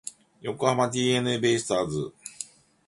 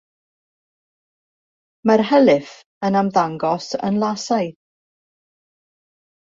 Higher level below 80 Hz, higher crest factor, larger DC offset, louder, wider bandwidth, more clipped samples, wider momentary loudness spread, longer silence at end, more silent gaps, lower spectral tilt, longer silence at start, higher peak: about the same, -60 dBFS vs -64 dBFS; about the same, 20 dB vs 20 dB; neither; second, -25 LUFS vs -19 LUFS; first, 11.5 kHz vs 7.8 kHz; neither; first, 15 LU vs 9 LU; second, 0.45 s vs 1.7 s; second, none vs 2.66-2.81 s; second, -4.5 dB/octave vs -6 dB/octave; second, 0.05 s vs 1.85 s; second, -8 dBFS vs -2 dBFS